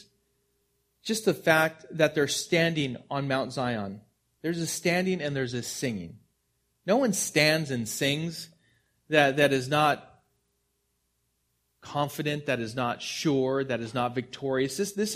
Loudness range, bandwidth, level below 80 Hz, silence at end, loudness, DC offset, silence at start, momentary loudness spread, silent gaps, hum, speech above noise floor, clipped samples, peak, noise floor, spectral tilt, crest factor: 5 LU; 15.5 kHz; -66 dBFS; 0 s; -27 LUFS; under 0.1%; 1.05 s; 11 LU; none; none; 48 dB; under 0.1%; -4 dBFS; -75 dBFS; -4 dB/octave; 24 dB